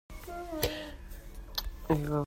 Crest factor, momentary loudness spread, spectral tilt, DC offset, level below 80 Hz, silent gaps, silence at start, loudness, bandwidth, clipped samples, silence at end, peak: 22 dB; 17 LU; -5.5 dB/octave; under 0.1%; -44 dBFS; none; 0.1 s; -36 LUFS; 16 kHz; under 0.1%; 0 s; -14 dBFS